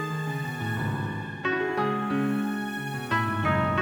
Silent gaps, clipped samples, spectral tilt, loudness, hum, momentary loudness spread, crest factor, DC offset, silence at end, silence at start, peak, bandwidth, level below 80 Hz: none; under 0.1%; -6.5 dB/octave; -28 LUFS; none; 6 LU; 16 dB; under 0.1%; 0 s; 0 s; -12 dBFS; over 20 kHz; -56 dBFS